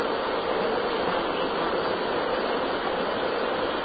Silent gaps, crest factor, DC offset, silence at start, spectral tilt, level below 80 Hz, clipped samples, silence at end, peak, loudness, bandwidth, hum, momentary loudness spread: none; 14 dB; under 0.1%; 0 s; -8.5 dB/octave; -54 dBFS; under 0.1%; 0 s; -12 dBFS; -26 LUFS; 5 kHz; none; 1 LU